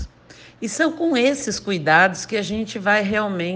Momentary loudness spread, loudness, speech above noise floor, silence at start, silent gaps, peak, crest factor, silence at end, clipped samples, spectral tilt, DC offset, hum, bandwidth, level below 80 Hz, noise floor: 11 LU; -20 LUFS; 26 dB; 0 s; none; -2 dBFS; 18 dB; 0 s; under 0.1%; -4 dB/octave; under 0.1%; none; 10 kHz; -48 dBFS; -46 dBFS